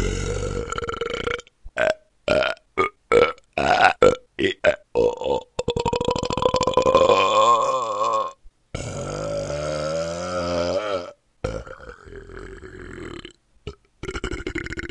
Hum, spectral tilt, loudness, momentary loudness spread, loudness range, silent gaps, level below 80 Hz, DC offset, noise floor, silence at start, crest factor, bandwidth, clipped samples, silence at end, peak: none; -4.5 dB/octave; -22 LUFS; 22 LU; 13 LU; none; -40 dBFS; under 0.1%; -44 dBFS; 0 s; 22 dB; 11 kHz; under 0.1%; 0 s; 0 dBFS